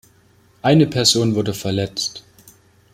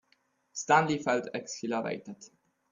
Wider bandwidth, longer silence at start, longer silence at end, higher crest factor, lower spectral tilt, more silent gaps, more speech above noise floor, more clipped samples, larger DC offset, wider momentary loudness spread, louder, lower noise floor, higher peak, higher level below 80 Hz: first, 16 kHz vs 7.8 kHz; about the same, 0.65 s vs 0.55 s; first, 0.75 s vs 0.45 s; about the same, 20 dB vs 22 dB; about the same, -4.5 dB/octave vs -4 dB/octave; neither; second, 37 dB vs 42 dB; neither; neither; second, 11 LU vs 18 LU; first, -18 LUFS vs -30 LUFS; second, -54 dBFS vs -72 dBFS; first, 0 dBFS vs -10 dBFS; first, -54 dBFS vs -72 dBFS